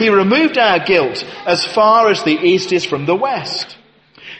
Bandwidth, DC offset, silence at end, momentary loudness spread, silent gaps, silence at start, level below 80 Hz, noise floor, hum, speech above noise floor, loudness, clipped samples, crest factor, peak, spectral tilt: 8.8 kHz; under 0.1%; 0 s; 10 LU; none; 0 s; -56 dBFS; -42 dBFS; none; 29 dB; -14 LUFS; under 0.1%; 14 dB; 0 dBFS; -4.5 dB/octave